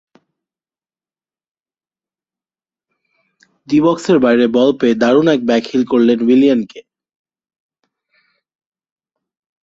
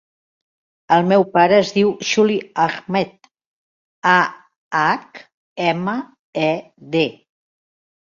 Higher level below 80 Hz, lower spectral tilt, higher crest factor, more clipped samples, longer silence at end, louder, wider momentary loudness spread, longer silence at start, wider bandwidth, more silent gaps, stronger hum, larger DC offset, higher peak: about the same, -60 dBFS vs -64 dBFS; first, -6.5 dB/octave vs -5 dB/octave; about the same, 16 dB vs 18 dB; neither; first, 2.85 s vs 1 s; first, -13 LUFS vs -18 LUFS; second, 4 LU vs 11 LU; first, 3.7 s vs 0.9 s; about the same, 7.8 kHz vs 7.4 kHz; second, none vs 3.46-4.02 s, 4.56-4.71 s, 5.34-5.56 s, 6.19-6.33 s; neither; neither; about the same, -2 dBFS vs -2 dBFS